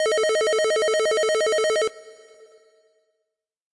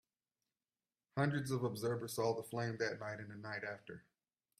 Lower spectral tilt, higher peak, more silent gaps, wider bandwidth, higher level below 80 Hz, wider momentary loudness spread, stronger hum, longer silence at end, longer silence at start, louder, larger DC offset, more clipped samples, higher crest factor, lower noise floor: second, 0 dB/octave vs -5.5 dB/octave; first, -18 dBFS vs -22 dBFS; neither; second, 11.5 kHz vs 15.5 kHz; first, -70 dBFS vs -78 dBFS; second, 2 LU vs 10 LU; neither; first, 1.6 s vs 0.6 s; second, 0 s vs 1.15 s; first, -21 LUFS vs -41 LUFS; neither; neither; second, 6 dB vs 20 dB; second, -81 dBFS vs under -90 dBFS